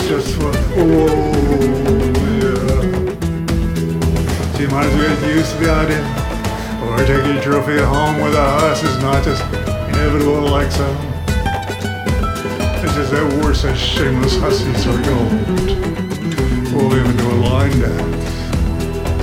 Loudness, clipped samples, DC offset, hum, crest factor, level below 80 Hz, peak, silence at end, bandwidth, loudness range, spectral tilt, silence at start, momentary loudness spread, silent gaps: -16 LUFS; under 0.1%; under 0.1%; none; 12 dB; -24 dBFS; -2 dBFS; 0 s; 16.5 kHz; 2 LU; -6 dB/octave; 0 s; 6 LU; none